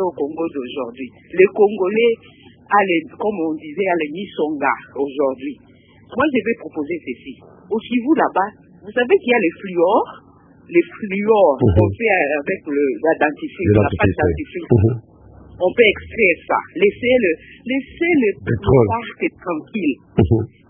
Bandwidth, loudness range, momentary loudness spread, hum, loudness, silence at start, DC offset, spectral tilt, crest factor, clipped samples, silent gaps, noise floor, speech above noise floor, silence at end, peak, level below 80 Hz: 3.7 kHz; 5 LU; 11 LU; none; -18 LUFS; 0 s; under 0.1%; -11 dB/octave; 18 dB; under 0.1%; none; -42 dBFS; 25 dB; 0.25 s; 0 dBFS; -38 dBFS